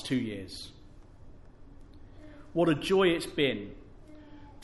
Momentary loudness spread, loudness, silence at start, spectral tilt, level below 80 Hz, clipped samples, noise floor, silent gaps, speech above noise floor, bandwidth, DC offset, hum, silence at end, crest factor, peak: 27 LU; -29 LUFS; 0 s; -5.5 dB/octave; -52 dBFS; under 0.1%; -51 dBFS; none; 22 dB; 11.5 kHz; under 0.1%; none; 0 s; 20 dB; -14 dBFS